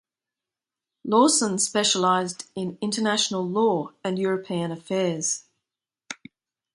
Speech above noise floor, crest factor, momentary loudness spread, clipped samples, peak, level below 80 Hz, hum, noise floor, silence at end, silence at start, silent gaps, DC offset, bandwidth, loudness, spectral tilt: 65 dB; 20 dB; 13 LU; under 0.1%; -6 dBFS; -72 dBFS; none; -89 dBFS; 0.6 s; 1.05 s; none; under 0.1%; 11.5 kHz; -23 LUFS; -3 dB/octave